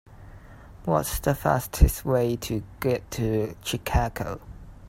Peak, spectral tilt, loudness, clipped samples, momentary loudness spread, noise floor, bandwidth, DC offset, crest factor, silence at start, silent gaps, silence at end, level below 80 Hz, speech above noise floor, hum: -4 dBFS; -5.5 dB/octave; -26 LUFS; under 0.1%; 11 LU; -46 dBFS; 16 kHz; under 0.1%; 22 dB; 0.1 s; none; 0 s; -30 dBFS; 21 dB; none